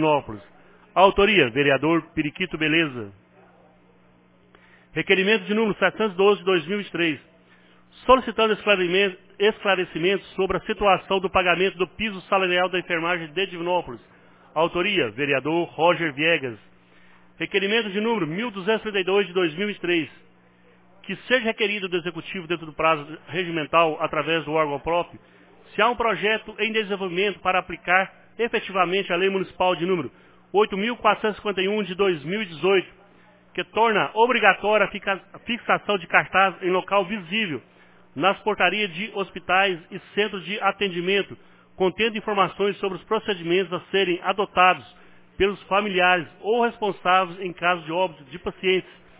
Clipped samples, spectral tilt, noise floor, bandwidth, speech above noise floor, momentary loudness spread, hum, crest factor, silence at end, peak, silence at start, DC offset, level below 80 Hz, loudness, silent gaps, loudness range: under 0.1%; -8.5 dB/octave; -56 dBFS; 4 kHz; 34 dB; 10 LU; none; 22 dB; 0.35 s; 0 dBFS; 0 s; under 0.1%; -54 dBFS; -22 LUFS; none; 3 LU